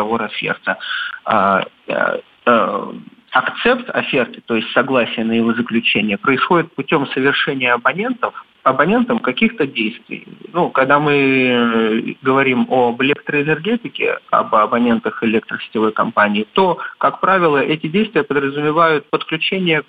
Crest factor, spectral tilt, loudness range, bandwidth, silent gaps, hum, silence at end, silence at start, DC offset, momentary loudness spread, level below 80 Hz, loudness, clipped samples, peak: 16 dB; -8 dB/octave; 2 LU; 4.9 kHz; none; none; 0.05 s; 0 s; under 0.1%; 7 LU; -58 dBFS; -16 LUFS; under 0.1%; 0 dBFS